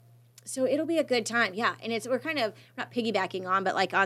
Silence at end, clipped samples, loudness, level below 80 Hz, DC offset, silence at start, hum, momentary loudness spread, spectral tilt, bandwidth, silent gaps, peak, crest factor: 0 s; under 0.1%; -29 LUFS; -84 dBFS; under 0.1%; 0.45 s; none; 8 LU; -3.5 dB/octave; 14.5 kHz; none; -10 dBFS; 20 dB